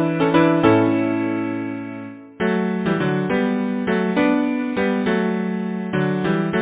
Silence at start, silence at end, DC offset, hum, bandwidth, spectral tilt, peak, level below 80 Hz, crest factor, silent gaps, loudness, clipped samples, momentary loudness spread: 0 s; 0 s; under 0.1%; none; 4 kHz; -11 dB/octave; -2 dBFS; -52 dBFS; 18 dB; none; -20 LUFS; under 0.1%; 9 LU